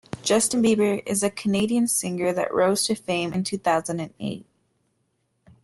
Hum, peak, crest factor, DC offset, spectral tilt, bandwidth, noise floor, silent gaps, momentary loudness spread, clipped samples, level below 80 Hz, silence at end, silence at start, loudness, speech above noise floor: none; -8 dBFS; 16 dB; under 0.1%; -4 dB/octave; 12.5 kHz; -72 dBFS; none; 10 LU; under 0.1%; -62 dBFS; 1.2 s; 0.15 s; -23 LUFS; 49 dB